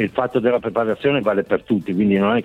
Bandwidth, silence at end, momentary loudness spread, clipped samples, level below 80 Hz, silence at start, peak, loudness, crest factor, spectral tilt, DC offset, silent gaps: 4.5 kHz; 0 s; 4 LU; under 0.1%; -54 dBFS; 0 s; -4 dBFS; -19 LUFS; 14 dB; -8.5 dB/octave; under 0.1%; none